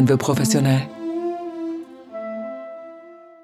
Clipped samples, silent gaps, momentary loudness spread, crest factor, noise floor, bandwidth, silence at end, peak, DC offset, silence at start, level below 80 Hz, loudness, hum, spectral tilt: under 0.1%; none; 19 LU; 16 dB; -43 dBFS; 14.5 kHz; 0.2 s; -6 dBFS; under 0.1%; 0 s; -64 dBFS; -23 LUFS; none; -6 dB/octave